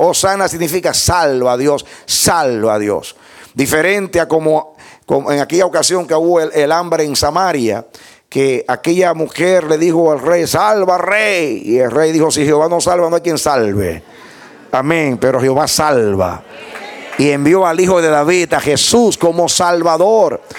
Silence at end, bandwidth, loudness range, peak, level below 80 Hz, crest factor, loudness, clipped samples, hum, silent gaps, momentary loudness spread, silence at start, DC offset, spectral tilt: 0 s; 18.5 kHz; 3 LU; 0 dBFS; -44 dBFS; 12 dB; -13 LUFS; under 0.1%; none; none; 8 LU; 0 s; under 0.1%; -4 dB/octave